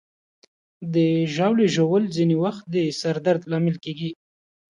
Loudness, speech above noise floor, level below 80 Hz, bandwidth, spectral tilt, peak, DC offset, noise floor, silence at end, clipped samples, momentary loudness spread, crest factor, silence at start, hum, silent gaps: -22 LUFS; over 69 dB; -68 dBFS; 11 kHz; -6.5 dB/octave; -8 dBFS; under 0.1%; under -90 dBFS; 0.55 s; under 0.1%; 11 LU; 16 dB; 0.8 s; none; none